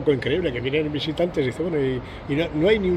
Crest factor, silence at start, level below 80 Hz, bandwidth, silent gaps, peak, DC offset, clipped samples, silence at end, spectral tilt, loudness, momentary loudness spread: 16 dB; 0 s; -42 dBFS; 10.5 kHz; none; -6 dBFS; under 0.1%; under 0.1%; 0 s; -7 dB/octave; -24 LUFS; 6 LU